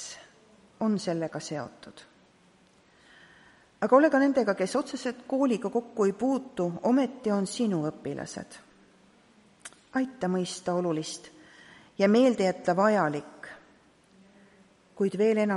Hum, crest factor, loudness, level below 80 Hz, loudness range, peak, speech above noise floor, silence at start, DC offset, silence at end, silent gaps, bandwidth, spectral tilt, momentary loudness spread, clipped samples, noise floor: none; 22 dB; -27 LUFS; -72 dBFS; 7 LU; -8 dBFS; 34 dB; 0 s; under 0.1%; 0 s; none; 11.5 kHz; -5.5 dB/octave; 21 LU; under 0.1%; -61 dBFS